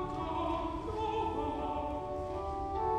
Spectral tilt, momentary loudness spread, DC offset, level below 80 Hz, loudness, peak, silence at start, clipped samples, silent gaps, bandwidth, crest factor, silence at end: -7.5 dB/octave; 4 LU; under 0.1%; -46 dBFS; -36 LUFS; -22 dBFS; 0 s; under 0.1%; none; 12 kHz; 12 dB; 0 s